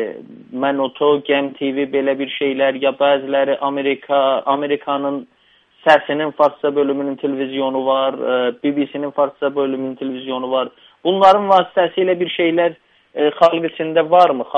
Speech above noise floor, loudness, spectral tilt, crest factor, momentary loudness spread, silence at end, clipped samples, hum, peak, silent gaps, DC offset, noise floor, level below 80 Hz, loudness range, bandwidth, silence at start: 35 dB; -17 LUFS; -6.5 dB/octave; 18 dB; 9 LU; 0 s; under 0.1%; none; 0 dBFS; none; under 0.1%; -52 dBFS; -66 dBFS; 4 LU; 8 kHz; 0 s